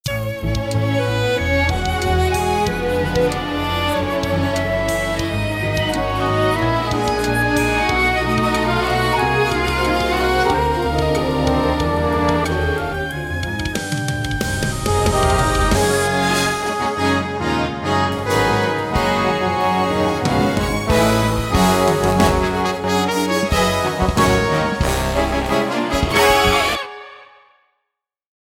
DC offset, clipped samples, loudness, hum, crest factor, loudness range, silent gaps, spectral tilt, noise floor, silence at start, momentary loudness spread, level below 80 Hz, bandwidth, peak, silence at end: under 0.1%; under 0.1%; -18 LUFS; none; 16 dB; 3 LU; none; -5 dB/octave; -79 dBFS; 0.05 s; 5 LU; -30 dBFS; 17.5 kHz; -2 dBFS; 1.2 s